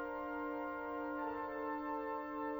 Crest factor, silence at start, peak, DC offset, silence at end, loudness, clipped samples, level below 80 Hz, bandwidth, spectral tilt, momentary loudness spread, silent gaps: 12 dB; 0 s; -30 dBFS; under 0.1%; 0 s; -42 LUFS; under 0.1%; -68 dBFS; over 20 kHz; -7 dB/octave; 1 LU; none